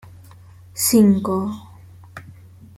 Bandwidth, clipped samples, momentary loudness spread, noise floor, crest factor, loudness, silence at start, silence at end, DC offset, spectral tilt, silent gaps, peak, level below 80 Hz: 16.5 kHz; under 0.1%; 26 LU; -44 dBFS; 18 dB; -17 LUFS; 0.75 s; 0.45 s; under 0.1%; -5 dB/octave; none; -4 dBFS; -56 dBFS